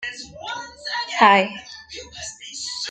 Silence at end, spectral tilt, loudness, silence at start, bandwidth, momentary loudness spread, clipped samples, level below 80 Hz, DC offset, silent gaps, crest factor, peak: 0 s; -2.5 dB/octave; -20 LUFS; 0 s; 9.4 kHz; 21 LU; under 0.1%; -58 dBFS; under 0.1%; none; 22 dB; -2 dBFS